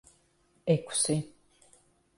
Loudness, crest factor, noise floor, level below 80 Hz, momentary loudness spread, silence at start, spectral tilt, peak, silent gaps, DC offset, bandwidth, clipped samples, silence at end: -29 LUFS; 20 dB; -68 dBFS; -68 dBFS; 12 LU; 0.65 s; -4.5 dB/octave; -14 dBFS; none; under 0.1%; 11.5 kHz; under 0.1%; 0.9 s